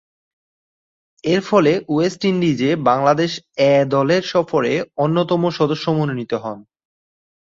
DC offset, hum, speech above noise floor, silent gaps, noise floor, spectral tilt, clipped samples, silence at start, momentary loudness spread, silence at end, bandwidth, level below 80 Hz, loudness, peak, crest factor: under 0.1%; none; over 73 dB; none; under -90 dBFS; -6.5 dB/octave; under 0.1%; 1.25 s; 8 LU; 1 s; 7.8 kHz; -60 dBFS; -18 LUFS; -2 dBFS; 16 dB